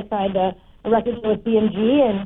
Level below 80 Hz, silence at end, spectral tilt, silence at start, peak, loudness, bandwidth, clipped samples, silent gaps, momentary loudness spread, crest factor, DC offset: -48 dBFS; 0 s; -10 dB/octave; 0 s; -8 dBFS; -20 LUFS; 4 kHz; under 0.1%; none; 6 LU; 12 dB; under 0.1%